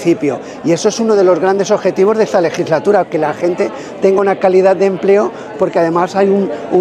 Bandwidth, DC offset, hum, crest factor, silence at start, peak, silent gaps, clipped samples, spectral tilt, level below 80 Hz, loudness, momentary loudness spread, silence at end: 10 kHz; under 0.1%; none; 12 dB; 0 s; 0 dBFS; none; under 0.1%; -6 dB/octave; -58 dBFS; -13 LUFS; 6 LU; 0 s